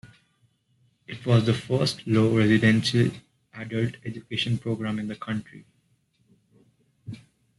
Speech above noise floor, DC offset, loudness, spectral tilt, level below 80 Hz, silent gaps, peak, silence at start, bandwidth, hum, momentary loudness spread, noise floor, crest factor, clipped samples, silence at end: 44 dB; under 0.1%; -24 LUFS; -6.5 dB/octave; -60 dBFS; none; -8 dBFS; 0.05 s; 12 kHz; none; 23 LU; -68 dBFS; 18 dB; under 0.1%; 0.4 s